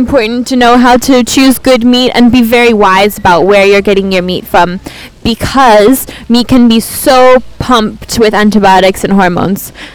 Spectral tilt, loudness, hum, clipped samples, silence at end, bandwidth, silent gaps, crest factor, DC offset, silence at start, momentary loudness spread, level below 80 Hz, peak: -4.5 dB/octave; -7 LUFS; none; 5%; 0.05 s; over 20 kHz; none; 6 dB; under 0.1%; 0 s; 8 LU; -30 dBFS; 0 dBFS